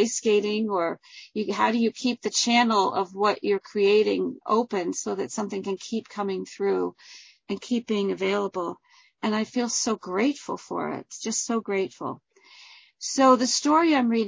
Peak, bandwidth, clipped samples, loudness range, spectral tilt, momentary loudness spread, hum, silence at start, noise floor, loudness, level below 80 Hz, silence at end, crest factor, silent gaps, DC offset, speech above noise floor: -6 dBFS; 8 kHz; under 0.1%; 6 LU; -3.5 dB/octave; 13 LU; none; 0 s; -51 dBFS; -25 LUFS; -72 dBFS; 0 s; 20 dB; none; under 0.1%; 27 dB